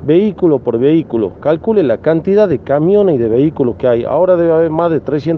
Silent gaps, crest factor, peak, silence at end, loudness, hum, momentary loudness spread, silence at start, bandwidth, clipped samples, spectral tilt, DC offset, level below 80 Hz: none; 12 dB; 0 dBFS; 0 s; -12 LUFS; none; 4 LU; 0 s; 6 kHz; under 0.1%; -10 dB/octave; under 0.1%; -48 dBFS